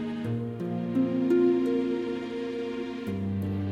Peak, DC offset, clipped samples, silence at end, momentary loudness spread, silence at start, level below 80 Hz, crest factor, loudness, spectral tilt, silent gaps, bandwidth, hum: -14 dBFS; under 0.1%; under 0.1%; 0 s; 10 LU; 0 s; -62 dBFS; 14 dB; -29 LUFS; -8.5 dB/octave; none; 8.2 kHz; none